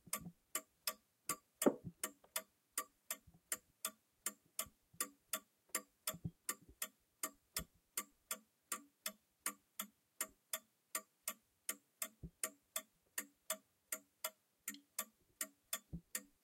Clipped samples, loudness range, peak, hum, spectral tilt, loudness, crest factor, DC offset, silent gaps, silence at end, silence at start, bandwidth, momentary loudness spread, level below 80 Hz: under 0.1%; 4 LU; -20 dBFS; none; -2 dB/octave; -46 LUFS; 30 dB; under 0.1%; none; 0.2 s; 0.05 s; 17 kHz; 5 LU; -74 dBFS